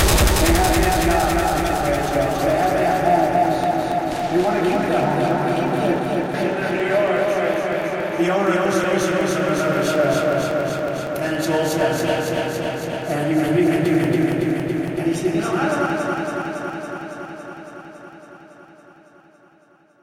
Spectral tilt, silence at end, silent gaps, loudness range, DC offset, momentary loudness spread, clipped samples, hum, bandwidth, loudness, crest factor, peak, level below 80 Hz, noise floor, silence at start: -5 dB/octave; 1.35 s; none; 7 LU; under 0.1%; 8 LU; under 0.1%; none; 17 kHz; -20 LUFS; 16 dB; -4 dBFS; -32 dBFS; -54 dBFS; 0 s